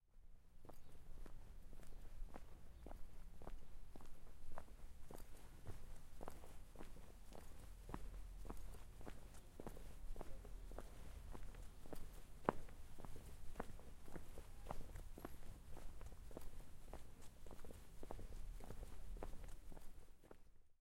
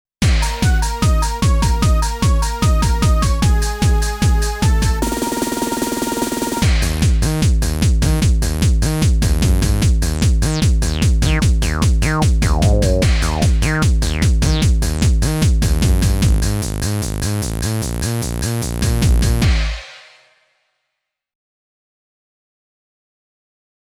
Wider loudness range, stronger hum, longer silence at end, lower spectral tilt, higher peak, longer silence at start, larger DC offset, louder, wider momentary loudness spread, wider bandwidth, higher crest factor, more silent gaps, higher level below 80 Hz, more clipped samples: first, 8 LU vs 4 LU; neither; second, 0.1 s vs 3.85 s; about the same, -5.5 dB/octave vs -5 dB/octave; second, -18 dBFS vs -2 dBFS; second, 0.05 s vs 0.2 s; neither; second, -59 LUFS vs -17 LUFS; first, 8 LU vs 5 LU; second, 16 kHz vs 18.5 kHz; first, 32 dB vs 14 dB; neither; second, -56 dBFS vs -18 dBFS; neither